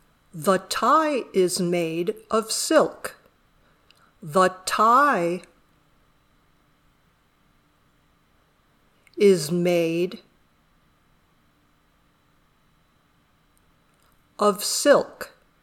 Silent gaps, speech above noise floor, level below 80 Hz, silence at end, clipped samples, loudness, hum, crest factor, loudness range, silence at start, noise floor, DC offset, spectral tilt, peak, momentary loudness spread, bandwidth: none; 42 dB; -66 dBFS; 0.35 s; under 0.1%; -21 LUFS; none; 22 dB; 7 LU; 0.35 s; -63 dBFS; under 0.1%; -4 dB/octave; -4 dBFS; 19 LU; 19 kHz